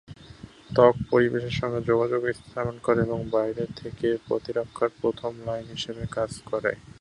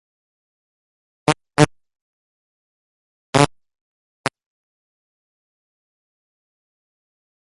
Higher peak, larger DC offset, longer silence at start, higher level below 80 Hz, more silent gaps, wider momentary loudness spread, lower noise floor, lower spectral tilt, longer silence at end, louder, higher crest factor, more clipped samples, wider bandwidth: second, -4 dBFS vs 0 dBFS; neither; second, 0.1 s vs 1.3 s; about the same, -52 dBFS vs -54 dBFS; second, none vs 2.01-3.33 s; about the same, 12 LU vs 11 LU; second, -46 dBFS vs under -90 dBFS; first, -6.5 dB/octave vs -5 dB/octave; second, 0.15 s vs 3.95 s; second, -26 LUFS vs -20 LUFS; about the same, 22 dB vs 26 dB; neither; about the same, 11 kHz vs 11 kHz